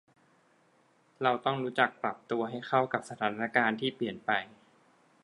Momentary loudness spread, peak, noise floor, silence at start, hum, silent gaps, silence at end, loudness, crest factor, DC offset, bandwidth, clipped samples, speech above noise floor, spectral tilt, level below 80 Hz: 6 LU; -8 dBFS; -67 dBFS; 1.2 s; none; none; 0.75 s; -31 LUFS; 24 dB; under 0.1%; 11.5 kHz; under 0.1%; 36 dB; -5.5 dB/octave; -80 dBFS